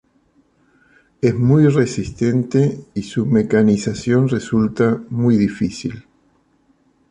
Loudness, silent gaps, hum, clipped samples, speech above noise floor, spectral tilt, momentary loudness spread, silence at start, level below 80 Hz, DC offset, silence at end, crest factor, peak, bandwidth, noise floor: -17 LUFS; none; none; under 0.1%; 43 dB; -7.5 dB/octave; 9 LU; 1.25 s; -48 dBFS; under 0.1%; 1.1 s; 16 dB; -2 dBFS; 10 kHz; -59 dBFS